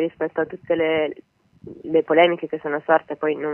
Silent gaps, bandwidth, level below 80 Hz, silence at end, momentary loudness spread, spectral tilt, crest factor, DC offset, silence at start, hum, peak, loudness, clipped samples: none; 3.3 kHz; -64 dBFS; 0 s; 10 LU; -8 dB/octave; 18 dB; under 0.1%; 0 s; none; -2 dBFS; -21 LUFS; under 0.1%